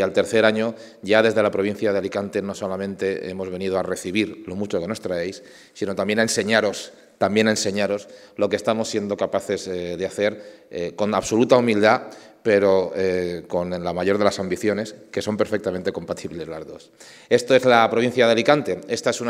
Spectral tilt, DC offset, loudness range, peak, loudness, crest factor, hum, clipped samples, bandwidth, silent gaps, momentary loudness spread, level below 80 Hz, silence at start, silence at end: -4.5 dB/octave; under 0.1%; 5 LU; 0 dBFS; -22 LUFS; 22 dB; none; under 0.1%; 15.5 kHz; none; 13 LU; -60 dBFS; 0 s; 0 s